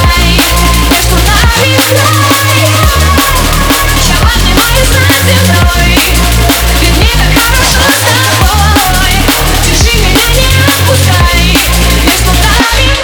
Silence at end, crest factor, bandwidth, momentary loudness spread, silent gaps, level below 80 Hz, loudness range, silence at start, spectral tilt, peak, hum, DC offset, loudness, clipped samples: 0 s; 6 dB; over 20 kHz; 2 LU; none; -12 dBFS; 0 LU; 0 s; -3.5 dB/octave; 0 dBFS; none; under 0.1%; -6 LUFS; 1%